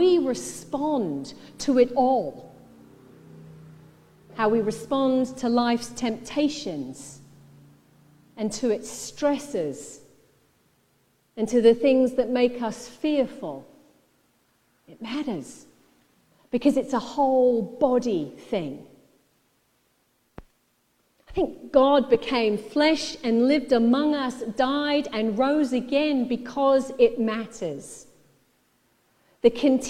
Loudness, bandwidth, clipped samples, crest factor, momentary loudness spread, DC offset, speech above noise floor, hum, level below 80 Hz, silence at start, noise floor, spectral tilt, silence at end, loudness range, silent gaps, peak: -24 LUFS; 13.5 kHz; under 0.1%; 20 dB; 15 LU; under 0.1%; 45 dB; none; -56 dBFS; 0 s; -68 dBFS; -5 dB/octave; 0 s; 8 LU; none; -6 dBFS